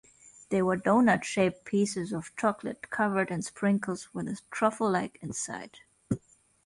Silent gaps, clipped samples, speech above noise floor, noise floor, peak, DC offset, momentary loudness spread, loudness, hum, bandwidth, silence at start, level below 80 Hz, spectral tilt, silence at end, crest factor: none; under 0.1%; 24 dB; -53 dBFS; -12 dBFS; under 0.1%; 11 LU; -29 LUFS; none; 11.5 kHz; 0.25 s; -64 dBFS; -5.5 dB/octave; 0.45 s; 18 dB